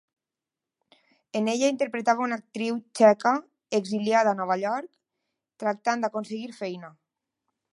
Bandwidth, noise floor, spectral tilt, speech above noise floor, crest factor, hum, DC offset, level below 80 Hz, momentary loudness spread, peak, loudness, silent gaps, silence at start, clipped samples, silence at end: 11.5 kHz; -89 dBFS; -4.5 dB/octave; 64 dB; 22 dB; none; under 0.1%; -82 dBFS; 14 LU; -6 dBFS; -26 LUFS; none; 1.35 s; under 0.1%; 0.85 s